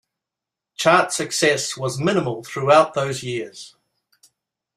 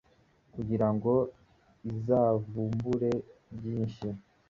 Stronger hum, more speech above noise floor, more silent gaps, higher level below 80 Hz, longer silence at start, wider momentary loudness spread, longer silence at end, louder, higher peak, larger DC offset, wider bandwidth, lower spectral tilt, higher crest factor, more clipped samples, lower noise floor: neither; first, 66 dB vs 36 dB; neither; about the same, -62 dBFS vs -58 dBFS; first, 0.8 s vs 0.55 s; about the same, 14 LU vs 14 LU; first, 1.1 s vs 0.3 s; first, -19 LUFS vs -31 LUFS; first, -2 dBFS vs -14 dBFS; neither; first, 14.5 kHz vs 7.2 kHz; second, -4 dB/octave vs -10 dB/octave; about the same, 20 dB vs 18 dB; neither; first, -86 dBFS vs -65 dBFS